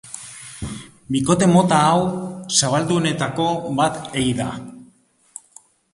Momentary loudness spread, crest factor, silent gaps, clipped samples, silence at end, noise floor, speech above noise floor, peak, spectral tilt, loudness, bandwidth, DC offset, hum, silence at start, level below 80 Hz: 21 LU; 18 dB; none; under 0.1%; 1.1 s; -56 dBFS; 38 dB; -2 dBFS; -4.5 dB/octave; -19 LUFS; 11.5 kHz; under 0.1%; none; 0.05 s; -48 dBFS